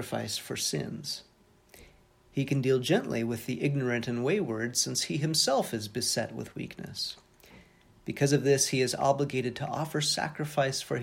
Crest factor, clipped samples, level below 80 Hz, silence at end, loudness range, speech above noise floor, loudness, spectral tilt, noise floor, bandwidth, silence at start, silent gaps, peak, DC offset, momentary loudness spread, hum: 20 dB; under 0.1%; -64 dBFS; 0 s; 3 LU; 30 dB; -29 LUFS; -4 dB/octave; -60 dBFS; 17 kHz; 0 s; none; -10 dBFS; under 0.1%; 12 LU; none